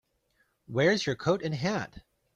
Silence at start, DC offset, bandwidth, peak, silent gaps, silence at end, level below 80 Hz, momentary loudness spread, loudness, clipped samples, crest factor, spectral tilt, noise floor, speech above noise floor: 0.7 s; under 0.1%; 11 kHz; -12 dBFS; none; 0.35 s; -62 dBFS; 10 LU; -29 LUFS; under 0.1%; 18 dB; -5.5 dB/octave; -72 dBFS; 44 dB